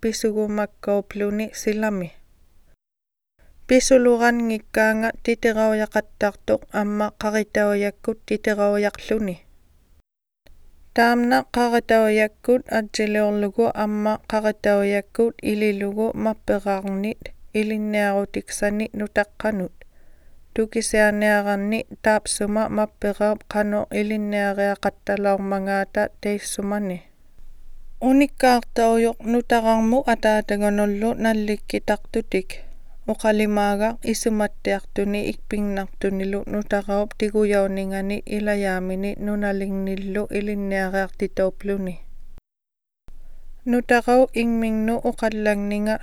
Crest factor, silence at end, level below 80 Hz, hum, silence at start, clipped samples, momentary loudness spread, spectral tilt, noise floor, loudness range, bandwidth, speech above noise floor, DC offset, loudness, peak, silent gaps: 18 dB; 0 s; -40 dBFS; none; 0 s; under 0.1%; 8 LU; -5 dB/octave; -87 dBFS; 5 LU; 18 kHz; 66 dB; under 0.1%; -22 LUFS; -4 dBFS; none